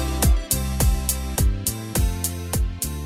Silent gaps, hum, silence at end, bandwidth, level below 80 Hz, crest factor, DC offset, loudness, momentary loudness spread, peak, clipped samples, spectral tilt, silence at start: none; none; 0 s; 16.5 kHz; -24 dBFS; 18 dB; under 0.1%; -23 LUFS; 5 LU; -4 dBFS; under 0.1%; -4 dB/octave; 0 s